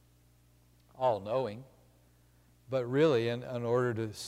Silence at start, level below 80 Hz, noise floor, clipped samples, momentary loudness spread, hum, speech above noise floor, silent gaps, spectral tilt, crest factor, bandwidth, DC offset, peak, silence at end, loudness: 0.95 s; -68 dBFS; -64 dBFS; under 0.1%; 9 LU; 60 Hz at -60 dBFS; 33 dB; none; -6.5 dB/octave; 16 dB; 15 kHz; under 0.1%; -16 dBFS; 0 s; -32 LUFS